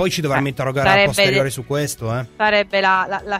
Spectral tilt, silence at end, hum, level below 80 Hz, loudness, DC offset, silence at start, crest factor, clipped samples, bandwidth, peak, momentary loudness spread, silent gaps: -4 dB/octave; 0 s; none; -46 dBFS; -17 LUFS; under 0.1%; 0 s; 18 dB; under 0.1%; 16 kHz; 0 dBFS; 9 LU; none